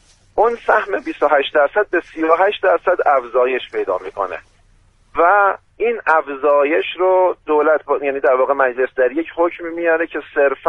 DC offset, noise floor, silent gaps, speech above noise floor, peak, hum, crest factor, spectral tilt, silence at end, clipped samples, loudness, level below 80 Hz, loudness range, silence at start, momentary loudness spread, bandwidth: under 0.1%; -53 dBFS; none; 36 dB; 0 dBFS; none; 16 dB; -5 dB/octave; 0 s; under 0.1%; -17 LUFS; -54 dBFS; 2 LU; 0.35 s; 7 LU; 6.6 kHz